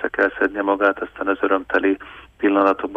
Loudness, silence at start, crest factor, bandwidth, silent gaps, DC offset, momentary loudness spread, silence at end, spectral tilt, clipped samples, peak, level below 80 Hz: -20 LUFS; 0 s; 16 dB; 5.6 kHz; none; under 0.1%; 7 LU; 0 s; -6.5 dB/octave; under 0.1%; -4 dBFS; -54 dBFS